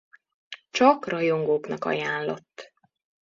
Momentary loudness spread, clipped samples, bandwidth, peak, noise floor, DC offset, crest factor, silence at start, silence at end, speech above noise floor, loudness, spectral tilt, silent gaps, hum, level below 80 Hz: 23 LU; under 0.1%; 7.6 kHz; -4 dBFS; -48 dBFS; under 0.1%; 22 dB; 0.5 s; 0.55 s; 24 dB; -24 LUFS; -5 dB/octave; none; none; -72 dBFS